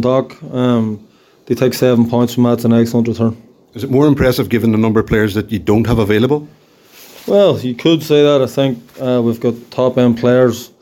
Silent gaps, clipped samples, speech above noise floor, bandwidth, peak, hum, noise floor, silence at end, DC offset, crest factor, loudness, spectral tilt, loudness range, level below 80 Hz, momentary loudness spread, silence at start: none; under 0.1%; 29 dB; 17 kHz; 0 dBFS; none; -42 dBFS; 0.15 s; under 0.1%; 12 dB; -14 LUFS; -7 dB/octave; 1 LU; -38 dBFS; 8 LU; 0 s